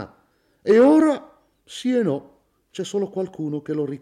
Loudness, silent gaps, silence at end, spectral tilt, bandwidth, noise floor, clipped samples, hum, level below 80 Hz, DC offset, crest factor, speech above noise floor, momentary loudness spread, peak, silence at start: -21 LUFS; none; 0.05 s; -6.5 dB/octave; 11.5 kHz; -62 dBFS; under 0.1%; none; -66 dBFS; under 0.1%; 16 dB; 43 dB; 18 LU; -6 dBFS; 0 s